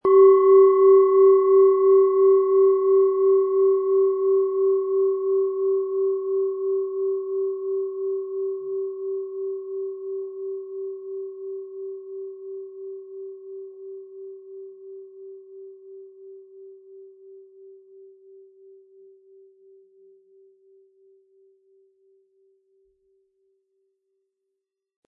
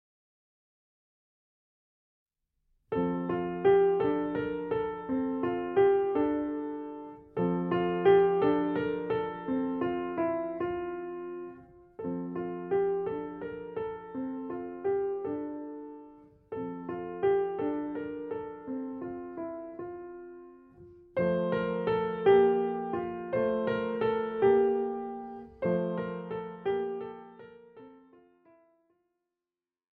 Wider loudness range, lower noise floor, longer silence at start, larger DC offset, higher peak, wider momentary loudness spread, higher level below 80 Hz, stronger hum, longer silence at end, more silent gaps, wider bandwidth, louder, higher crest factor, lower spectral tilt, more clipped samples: first, 25 LU vs 10 LU; second, -82 dBFS vs under -90 dBFS; second, 0.05 s vs 2.9 s; neither; first, -6 dBFS vs -12 dBFS; first, 25 LU vs 16 LU; second, -80 dBFS vs -64 dBFS; neither; first, 7.7 s vs 2 s; neither; second, 2.1 kHz vs 4.3 kHz; first, -20 LUFS vs -31 LUFS; about the same, 16 dB vs 20 dB; first, -10.5 dB/octave vs -6 dB/octave; neither